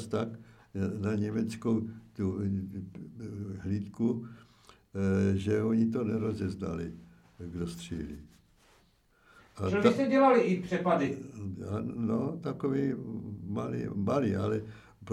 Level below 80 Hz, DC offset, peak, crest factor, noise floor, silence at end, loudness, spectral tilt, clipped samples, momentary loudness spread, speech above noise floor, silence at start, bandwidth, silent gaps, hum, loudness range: -60 dBFS; under 0.1%; -10 dBFS; 22 dB; -66 dBFS; 0 s; -31 LUFS; -7.5 dB/octave; under 0.1%; 16 LU; 35 dB; 0 s; 12 kHz; none; none; 8 LU